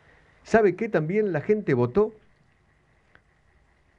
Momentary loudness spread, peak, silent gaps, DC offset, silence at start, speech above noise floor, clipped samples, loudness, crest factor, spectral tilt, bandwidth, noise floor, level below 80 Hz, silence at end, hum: 4 LU; -6 dBFS; none; under 0.1%; 0.45 s; 40 dB; under 0.1%; -24 LUFS; 20 dB; -8 dB/octave; 8.2 kHz; -63 dBFS; -56 dBFS; 1.85 s; none